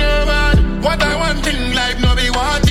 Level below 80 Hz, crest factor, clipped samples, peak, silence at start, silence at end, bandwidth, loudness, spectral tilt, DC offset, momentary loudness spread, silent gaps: -18 dBFS; 14 dB; under 0.1%; 0 dBFS; 0 s; 0 s; 15.5 kHz; -15 LUFS; -4.5 dB/octave; under 0.1%; 3 LU; none